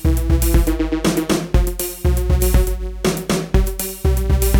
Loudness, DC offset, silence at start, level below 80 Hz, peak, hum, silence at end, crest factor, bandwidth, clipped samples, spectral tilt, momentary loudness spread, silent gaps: -19 LUFS; under 0.1%; 0 s; -18 dBFS; -2 dBFS; none; 0 s; 14 dB; 19.5 kHz; under 0.1%; -5.5 dB/octave; 5 LU; none